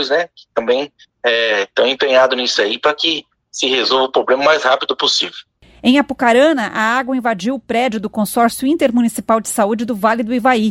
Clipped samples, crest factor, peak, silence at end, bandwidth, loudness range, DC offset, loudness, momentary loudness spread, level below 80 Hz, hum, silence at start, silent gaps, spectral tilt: under 0.1%; 16 dB; 0 dBFS; 0 s; 16.5 kHz; 2 LU; under 0.1%; -15 LUFS; 7 LU; -56 dBFS; none; 0 s; none; -3 dB/octave